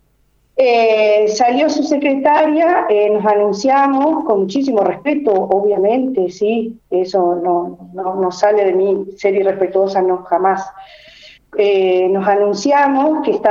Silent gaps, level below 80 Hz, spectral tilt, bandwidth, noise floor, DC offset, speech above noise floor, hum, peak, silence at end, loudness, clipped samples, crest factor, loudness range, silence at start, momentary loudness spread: none; -58 dBFS; -5.5 dB/octave; 7.6 kHz; -58 dBFS; under 0.1%; 43 dB; none; 0 dBFS; 0 s; -14 LUFS; under 0.1%; 14 dB; 3 LU; 0.55 s; 6 LU